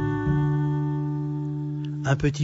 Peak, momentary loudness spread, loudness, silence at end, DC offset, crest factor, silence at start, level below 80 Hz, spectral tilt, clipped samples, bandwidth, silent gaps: -10 dBFS; 6 LU; -26 LUFS; 0 s; under 0.1%; 16 dB; 0 s; -44 dBFS; -7.5 dB/octave; under 0.1%; 7.8 kHz; none